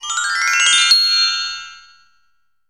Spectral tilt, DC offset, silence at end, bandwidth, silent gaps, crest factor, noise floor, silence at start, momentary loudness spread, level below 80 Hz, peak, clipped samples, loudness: 5.5 dB/octave; 0.2%; 0.9 s; 17 kHz; none; 16 dB; -67 dBFS; 0 s; 13 LU; -60 dBFS; -2 dBFS; under 0.1%; -13 LUFS